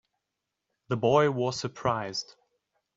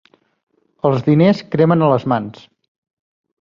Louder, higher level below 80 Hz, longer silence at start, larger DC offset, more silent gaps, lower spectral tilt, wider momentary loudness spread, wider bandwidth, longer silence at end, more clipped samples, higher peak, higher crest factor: second, -28 LUFS vs -15 LUFS; second, -64 dBFS vs -56 dBFS; about the same, 0.9 s vs 0.85 s; neither; neither; second, -5.5 dB/octave vs -9 dB/octave; first, 12 LU vs 8 LU; first, 7.8 kHz vs 7 kHz; second, 0.65 s vs 1.1 s; neither; second, -8 dBFS vs -2 dBFS; first, 22 dB vs 16 dB